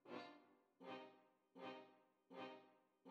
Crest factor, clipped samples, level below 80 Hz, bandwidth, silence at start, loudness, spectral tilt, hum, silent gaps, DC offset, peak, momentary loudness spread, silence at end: 18 dB; under 0.1%; under -90 dBFS; 7.6 kHz; 0.05 s; -59 LUFS; -2.5 dB/octave; none; none; under 0.1%; -42 dBFS; 7 LU; 0 s